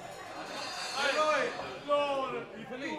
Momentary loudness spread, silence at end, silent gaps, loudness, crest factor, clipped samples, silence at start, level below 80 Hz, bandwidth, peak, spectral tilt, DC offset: 13 LU; 0 s; none; -33 LUFS; 16 dB; under 0.1%; 0 s; -70 dBFS; 14 kHz; -18 dBFS; -2.5 dB/octave; under 0.1%